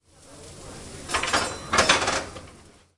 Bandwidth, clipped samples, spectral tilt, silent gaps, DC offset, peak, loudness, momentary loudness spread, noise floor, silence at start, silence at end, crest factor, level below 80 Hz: 12 kHz; under 0.1%; -1.5 dB/octave; none; under 0.1%; -4 dBFS; -23 LUFS; 23 LU; -51 dBFS; 0.25 s; 0.35 s; 22 dB; -48 dBFS